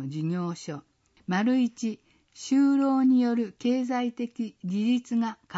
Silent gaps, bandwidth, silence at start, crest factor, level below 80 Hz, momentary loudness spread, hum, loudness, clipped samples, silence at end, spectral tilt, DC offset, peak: none; 8 kHz; 0 s; 12 dB; -74 dBFS; 16 LU; none; -26 LUFS; under 0.1%; 0 s; -6.5 dB/octave; under 0.1%; -14 dBFS